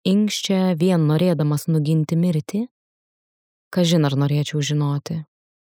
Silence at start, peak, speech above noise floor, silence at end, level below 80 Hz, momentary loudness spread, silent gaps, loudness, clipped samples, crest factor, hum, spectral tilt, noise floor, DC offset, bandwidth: 0.05 s; -8 dBFS; over 71 dB; 0.5 s; -68 dBFS; 9 LU; 2.71-3.71 s; -20 LUFS; under 0.1%; 12 dB; none; -6.5 dB/octave; under -90 dBFS; under 0.1%; 17 kHz